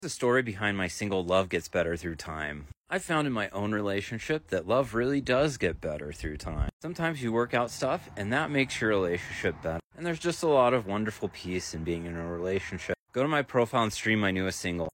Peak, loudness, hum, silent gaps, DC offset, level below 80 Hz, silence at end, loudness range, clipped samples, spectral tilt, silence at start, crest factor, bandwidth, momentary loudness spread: -12 dBFS; -30 LUFS; none; 2.77-2.82 s, 6.73-6.80 s, 9.84-9.90 s, 12.99-13.06 s; under 0.1%; -48 dBFS; 0.05 s; 2 LU; under 0.1%; -5 dB/octave; 0 s; 18 dB; 16.5 kHz; 9 LU